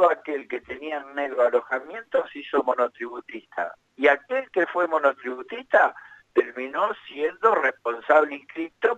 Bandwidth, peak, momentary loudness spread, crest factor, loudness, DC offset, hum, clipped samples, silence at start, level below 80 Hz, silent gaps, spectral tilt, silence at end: 8 kHz; -6 dBFS; 13 LU; 18 dB; -24 LUFS; under 0.1%; none; under 0.1%; 0 s; -70 dBFS; none; -4.5 dB/octave; 0 s